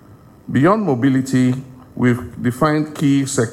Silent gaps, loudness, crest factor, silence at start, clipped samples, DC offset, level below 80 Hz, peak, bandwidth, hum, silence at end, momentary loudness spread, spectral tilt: none; -17 LUFS; 14 dB; 0.1 s; under 0.1%; under 0.1%; -50 dBFS; -4 dBFS; 15.5 kHz; none; 0 s; 7 LU; -6.5 dB/octave